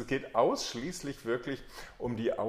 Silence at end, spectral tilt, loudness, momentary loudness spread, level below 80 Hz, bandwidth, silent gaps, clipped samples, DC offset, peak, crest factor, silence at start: 0 s; -4.5 dB/octave; -34 LUFS; 11 LU; -56 dBFS; 15.5 kHz; none; under 0.1%; under 0.1%; -14 dBFS; 18 dB; 0 s